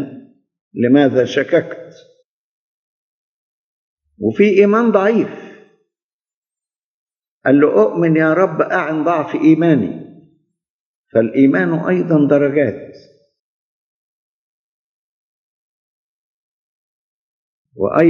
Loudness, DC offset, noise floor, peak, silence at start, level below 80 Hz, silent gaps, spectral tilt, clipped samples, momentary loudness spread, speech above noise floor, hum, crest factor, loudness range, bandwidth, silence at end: -14 LUFS; under 0.1%; under -90 dBFS; 0 dBFS; 0 s; -66 dBFS; 0.61-0.71 s, 2.25-3.97 s, 6.03-6.20 s, 6.34-6.42 s, 6.78-7.07 s, 7.28-7.41 s, 10.69-11.04 s, 13.40-17.65 s; -8 dB/octave; under 0.1%; 13 LU; over 77 dB; none; 18 dB; 6 LU; 6.8 kHz; 0 s